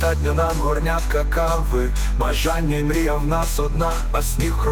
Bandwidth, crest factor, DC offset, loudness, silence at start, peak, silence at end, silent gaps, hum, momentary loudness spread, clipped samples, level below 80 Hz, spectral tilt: 18.5 kHz; 12 dB; under 0.1%; -21 LUFS; 0 s; -8 dBFS; 0 s; none; none; 2 LU; under 0.1%; -22 dBFS; -5.5 dB/octave